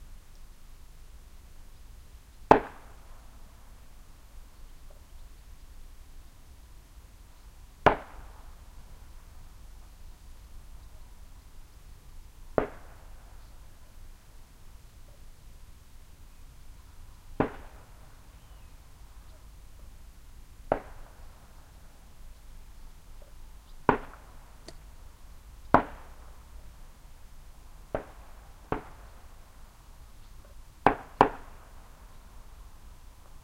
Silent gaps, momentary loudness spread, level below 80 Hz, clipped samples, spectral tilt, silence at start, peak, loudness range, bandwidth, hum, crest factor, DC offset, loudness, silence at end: none; 27 LU; -48 dBFS; under 0.1%; -6 dB/octave; 0 s; 0 dBFS; 22 LU; 16 kHz; none; 36 dB; under 0.1%; -29 LUFS; 0 s